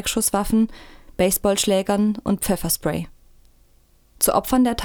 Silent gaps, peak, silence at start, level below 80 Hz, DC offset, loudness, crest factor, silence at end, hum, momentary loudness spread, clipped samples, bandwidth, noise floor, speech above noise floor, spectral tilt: none; -4 dBFS; 0 s; -40 dBFS; under 0.1%; -21 LUFS; 18 dB; 0 s; none; 8 LU; under 0.1%; over 20 kHz; -56 dBFS; 35 dB; -4 dB/octave